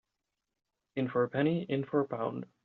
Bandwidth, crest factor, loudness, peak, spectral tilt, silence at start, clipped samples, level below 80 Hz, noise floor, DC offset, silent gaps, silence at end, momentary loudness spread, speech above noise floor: 4.4 kHz; 18 dB; -33 LUFS; -16 dBFS; -6.5 dB/octave; 0.95 s; under 0.1%; -74 dBFS; -87 dBFS; under 0.1%; none; 0.2 s; 7 LU; 55 dB